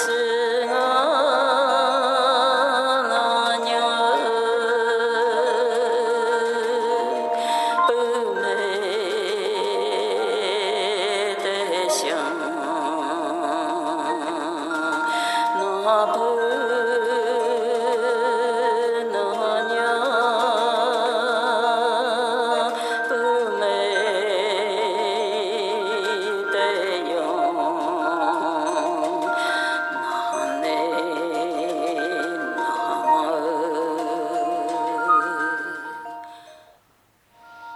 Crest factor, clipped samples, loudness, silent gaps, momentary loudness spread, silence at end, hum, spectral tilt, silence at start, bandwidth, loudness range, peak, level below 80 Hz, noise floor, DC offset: 16 dB; under 0.1%; -22 LUFS; none; 6 LU; 0 s; none; -2 dB/octave; 0 s; 13 kHz; 4 LU; -6 dBFS; -74 dBFS; -61 dBFS; under 0.1%